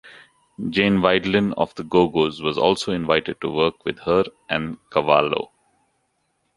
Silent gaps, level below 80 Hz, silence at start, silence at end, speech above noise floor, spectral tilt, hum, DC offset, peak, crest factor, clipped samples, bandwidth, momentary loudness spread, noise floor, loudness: none; -52 dBFS; 0.05 s; 1.1 s; 50 dB; -6 dB/octave; none; under 0.1%; -2 dBFS; 20 dB; under 0.1%; 11.5 kHz; 8 LU; -70 dBFS; -21 LUFS